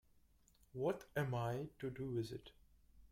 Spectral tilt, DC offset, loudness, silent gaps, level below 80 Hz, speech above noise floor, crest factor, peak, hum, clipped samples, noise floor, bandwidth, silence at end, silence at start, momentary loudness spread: -7 dB/octave; under 0.1%; -43 LUFS; none; -68 dBFS; 29 dB; 18 dB; -26 dBFS; none; under 0.1%; -72 dBFS; 16 kHz; 0.05 s; 0.75 s; 9 LU